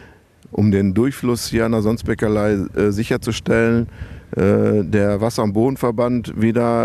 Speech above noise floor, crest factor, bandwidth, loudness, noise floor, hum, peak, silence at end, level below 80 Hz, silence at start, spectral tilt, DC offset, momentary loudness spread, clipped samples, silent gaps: 29 dB; 14 dB; 14 kHz; -18 LUFS; -46 dBFS; none; -4 dBFS; 0 s; -42 dBFS; 0.5 s; -7 dB/octave; under 0.1%; 5 LU; under 0.1%; none